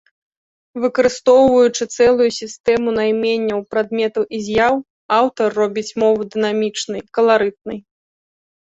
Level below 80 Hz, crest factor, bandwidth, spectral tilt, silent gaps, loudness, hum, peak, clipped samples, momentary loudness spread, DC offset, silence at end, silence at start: -52 dBFS; 16 dB; 8 kHz; -4 dB/octave; 2.60-2.64 s, 4.90-5.09 s; -17 LUFS; none; -2 dBFS; under 0.1%; 10 LU; under 0.1%; 0.95 s; 0.75 s